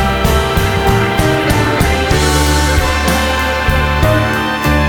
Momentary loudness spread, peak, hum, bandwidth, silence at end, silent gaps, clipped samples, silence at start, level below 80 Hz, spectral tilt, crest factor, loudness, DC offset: 2 LU; 0 dBFS; none; 19 kHz; 0 s; none; under 0.1%; 0 s; -18 dBFS; -4.5 dB/octave; 12 dB; -13 LUFS; under 0.1%